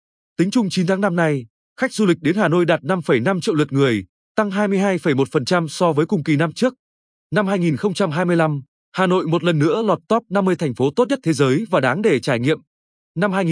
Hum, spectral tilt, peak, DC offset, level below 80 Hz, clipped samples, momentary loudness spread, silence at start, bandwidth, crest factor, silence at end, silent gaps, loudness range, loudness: none; -6.5 dB/octave; -2 dBFS; under 0.1%; -64 dBFS; under 0.1%; 5 LU; 0.4 s; 10.5 kHz; 16 dB; 0 s; 1.50-1.76 s, 4.09-4.35 s, 6.79-7.30 s, 8.68-8.92 s, 12.67-13.15 s; 1 LU; -19 LUFS